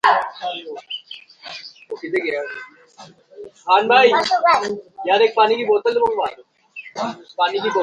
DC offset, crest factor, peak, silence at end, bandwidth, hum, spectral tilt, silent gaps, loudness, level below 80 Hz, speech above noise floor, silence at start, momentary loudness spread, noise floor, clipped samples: under 0.1%; 18 dB; 0 dBFS; 0 s; 10.5 kHz; none; -3 dB/octave; none; -18 LUFS; -64 dBFS; 27 dB; 0.05 s; 20 LU; -45 dBFS; under 0.1%